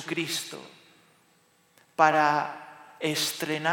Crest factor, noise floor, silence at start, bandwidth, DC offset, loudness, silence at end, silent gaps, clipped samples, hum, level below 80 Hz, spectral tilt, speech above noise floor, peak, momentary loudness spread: 24 dB; -64 dBFS; 0 s; 19.5 kHz; under 0.1%; -26 LUFS; 0 s; none; under 0.1%; none; -80 dBFS; -3 dB/octave; 38 dB; -6 dBFS; 21 LU